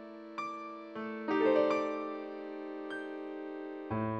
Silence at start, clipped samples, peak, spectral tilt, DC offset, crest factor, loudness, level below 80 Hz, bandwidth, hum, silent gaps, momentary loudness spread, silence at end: 0 s; under 0.1%; -16 dBFS; -7 dB/octave; under 0.1%; 20 dB; -36 LUFS; -72 dBFS; 8.8 kHz; none; none; 14 LU; 0 s